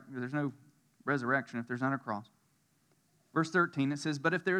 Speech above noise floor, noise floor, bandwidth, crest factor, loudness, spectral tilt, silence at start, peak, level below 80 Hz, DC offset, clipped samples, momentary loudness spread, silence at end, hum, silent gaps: 40 dB; -72 dBFS; 11 kHz; 20 dB; -34 LUFS; -6 dB/octave; 0.05 s; -16 dBFS; under -90 dBFS; under 0.1%; under 0.1%; 10 LU; 0 s; none; none